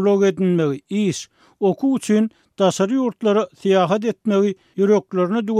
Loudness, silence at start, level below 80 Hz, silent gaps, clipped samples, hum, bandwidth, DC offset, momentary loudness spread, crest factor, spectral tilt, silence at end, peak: -19 LUFS; 0 s; -68 dBFS; none; under 0.1%; none; 12.5 kHz; under 0.1%; 5 LU; 14 dB; -6.5 dB/octave; 0 s; -4 dBFS